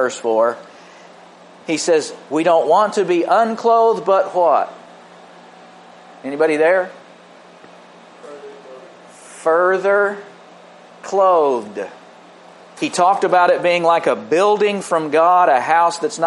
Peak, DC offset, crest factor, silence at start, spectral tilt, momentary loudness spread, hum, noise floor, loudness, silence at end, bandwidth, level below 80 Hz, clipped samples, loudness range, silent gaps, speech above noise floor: -2 dBFS; under 0.1%; 16 dB; 0 s; -4 dB/octave; 16 LU; none; -43 dBFS; -16 LUFS; 0 s; 11.5 kHz; -76 dBFS; under 0.1%; 7 LU; none; 28 dB